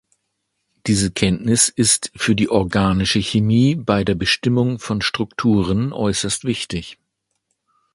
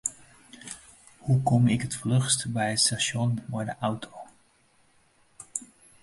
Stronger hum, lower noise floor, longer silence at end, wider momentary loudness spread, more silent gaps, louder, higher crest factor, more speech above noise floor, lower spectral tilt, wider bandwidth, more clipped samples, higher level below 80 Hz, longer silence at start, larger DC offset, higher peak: neither; first, -74 dBFS vs -64 dBFS; first, 1 s vs 0.35 s; second, 6 LU vs 19 LU; neither; first, -18 LUFS vs -26 LUFS; about the same, 18 dB vs 20 dB; first, 56 dB vs 38 dB; about the same, -4.5 dB/octave vs -4 dB/octave; about the same, 11.5 kHz vs 11.5 kHz; neither; first, -40 dBFS vs -60 dBFS; first, 0.85 s vs 0.05 s; neither; first, 0 dBFS vs -8 dBFS